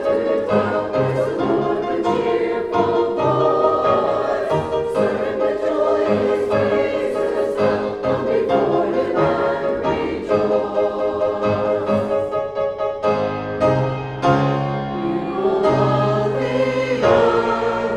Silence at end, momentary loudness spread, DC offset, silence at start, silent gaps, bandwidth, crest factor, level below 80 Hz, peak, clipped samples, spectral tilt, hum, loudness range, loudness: 0 s; 5 LU; under 0.1%; 0 s; none; 11 kHz; 16 dB; -48 dBFS; -2 dBFS; under 0.1%; -7.5 dB/octave; none; 2 LU; -19 LUFS